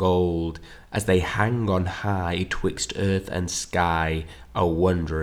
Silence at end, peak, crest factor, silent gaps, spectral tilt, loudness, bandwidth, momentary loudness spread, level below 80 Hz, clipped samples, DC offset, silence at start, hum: 0 s; -6 dBFS; 18 dB; none; -5.5 dB/octave; -25 LUFS; 15 kHz; 8 LU; -40 dBFS; under 0.1%; under 0.1%; 0 s; none